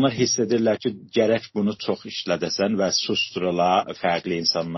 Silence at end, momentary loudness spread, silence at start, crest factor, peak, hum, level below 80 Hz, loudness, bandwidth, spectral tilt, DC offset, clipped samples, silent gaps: 0 s; 6 LU; 0 s; 16 dB; -6 dBFS; none; -62 dBFS; -23 LUFS; 6.2 kHz; -3.5 dB/octave; under 0.1%; under 0.1%; none